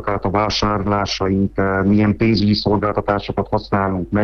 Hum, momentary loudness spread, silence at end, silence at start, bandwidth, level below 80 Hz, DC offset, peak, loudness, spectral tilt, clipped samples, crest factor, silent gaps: none; 5 LU; 0 s; 0 s; 6.8 kHz; -36 dBFS; under 0.1%; -4 dBFS; -18 LUFS; -6.5 dB/octave; under 0.1%; 14 dB; none